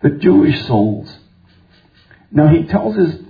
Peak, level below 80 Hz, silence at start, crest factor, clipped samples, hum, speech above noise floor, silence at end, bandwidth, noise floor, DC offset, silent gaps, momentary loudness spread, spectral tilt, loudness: 0 dBFS; -42 dBFS; 0 s; 14 dB; under 0.1%; none; 37 dB; 0.05 s; 5 kHz; -50 dBFS; under 0.1%; none; 8 LU; -10.5 dB/octave; -13 LUFS